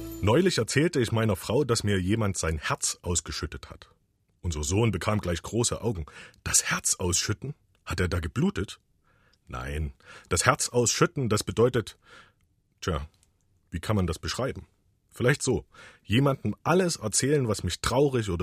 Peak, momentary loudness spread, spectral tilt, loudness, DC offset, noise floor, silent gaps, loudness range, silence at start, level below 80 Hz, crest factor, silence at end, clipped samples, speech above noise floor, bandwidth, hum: -2 dBFS; 14 LU; -4.5 dB/octave; -27 LUFS; under 0.1%; -69 dBFS; none; 5 LU; 0 s; -44 dBFS; 26 dB; 0 s; under 0.1%; 42 dB; 15.5 kHz; none